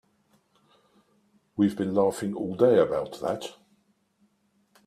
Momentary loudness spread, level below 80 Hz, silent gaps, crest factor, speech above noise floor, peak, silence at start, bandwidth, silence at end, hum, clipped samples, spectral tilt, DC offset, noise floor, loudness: 13 LU; -66 dBFS; none; 22 dB; 44 dB; -6 dBFS; 1.55 s; 14.5 kHz; 1.35 s; none; under 0.1%; -6.5 dB/octave; under 0.1%; -69 dBFS; -26 LUFS